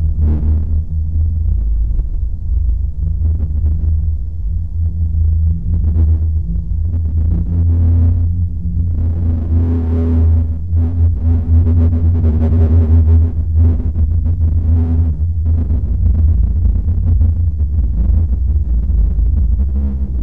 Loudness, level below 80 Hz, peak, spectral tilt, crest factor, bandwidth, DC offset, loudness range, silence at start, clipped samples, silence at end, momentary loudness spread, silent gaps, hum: -16 LUFS; -16 dBFS; -4 dBFS; -12.5 dB/octave; 8 dB; 1.6 kHz; 5%; 5 LU; 0 s; under 0.1%; 0 s; 6 LU; none; none